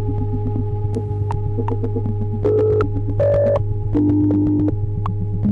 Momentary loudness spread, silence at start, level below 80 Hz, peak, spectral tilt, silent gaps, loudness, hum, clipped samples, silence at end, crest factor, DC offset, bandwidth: 7 LU; 0 s; -30 dBFS; -6 dBFS; -11 dB/octave; none; -20 LUFS; none; under 0.1%; 0 s; 12 dB; under 0.1%; 4.1 kHz